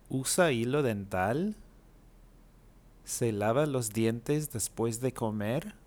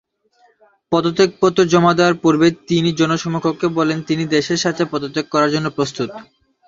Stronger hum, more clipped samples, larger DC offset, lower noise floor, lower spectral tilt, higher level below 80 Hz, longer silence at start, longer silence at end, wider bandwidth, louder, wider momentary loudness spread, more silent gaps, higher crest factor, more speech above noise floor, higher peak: neither; neither; neither; about the same, -57 dBFS vs -57 dBFS; about the same, -5 dB/octave vs -5.5 dB/octave; about the same, -58 dBFS vs -56 dBFS; second, 0.1 s vs 0.9 s; second, 0.1 s vs 0.45 s; first, over 20 kHz vs 7.8 kHz; second, -31 LUFS vs -17 LUFS; about the same, 7 LU vs 8 LU; neither; about the same, 18 dB vs 18 dB; second, 27 dB vs 41 dB; second, -14 dBFS vs 0 dBFS